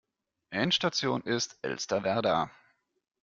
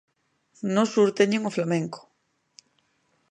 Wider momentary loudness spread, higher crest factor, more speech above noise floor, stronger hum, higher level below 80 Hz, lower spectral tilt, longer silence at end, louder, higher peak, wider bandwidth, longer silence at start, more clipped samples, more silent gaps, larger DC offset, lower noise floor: second, 8 LU vs 14 LU; about the same, 18 dB vs 20 dB; second, 31 dB vs 49 dB; neither; first, -68 dBFS vs -78 dBFS; second, -3.5 dB/octave vs -5.5 dB/octave; second, 0.7 s vs 1.35 s; second, -30 LUFS vs -24 LUFS; second, -14 dBFS vs -8 dBFS; second, 7.6 kHz vs 9.8 kHz; second, 0.5 s vs 0.65 s; neither; neither; neither; second, -61 dBFS vs -72 dBFS